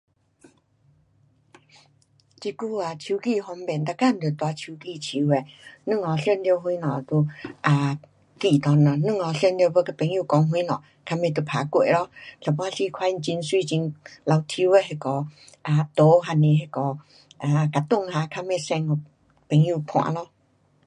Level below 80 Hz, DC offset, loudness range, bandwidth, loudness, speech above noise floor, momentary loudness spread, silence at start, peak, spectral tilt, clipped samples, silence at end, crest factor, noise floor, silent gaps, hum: -68 dBFS; under 0.1%; 6 LU; 10.5 kHz; -23 LUFS; 41 dB; 12 LU; 2.4 s; -6 dBFS; -7 dB/octave; under 0.1%; 0.6 s; 18 dB; -64 dBFS; none; none